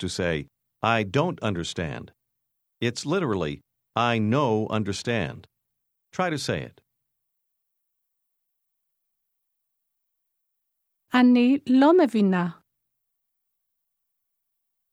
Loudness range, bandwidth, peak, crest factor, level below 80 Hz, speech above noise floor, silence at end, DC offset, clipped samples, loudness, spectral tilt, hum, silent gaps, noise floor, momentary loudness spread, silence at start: 12 LU; 12 kHz; -6 dBFS; 20 dB; -58 dBFS; 56 dB; 2.4 s; under 0.1%; under 0.1%; -24 LUFS; -6 dB/octave; none; none; -79 dBFS; 14 LU; 0 s